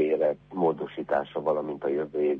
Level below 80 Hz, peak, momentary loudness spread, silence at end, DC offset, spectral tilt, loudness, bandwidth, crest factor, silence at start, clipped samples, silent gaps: -64 dBFS; -12 dBFS; 3 LU; 0 s; under 0.1%; -9 dB/octave; -28 LUFS; 4.3 kHz; 14 dB; 0 s; under 0.1%; none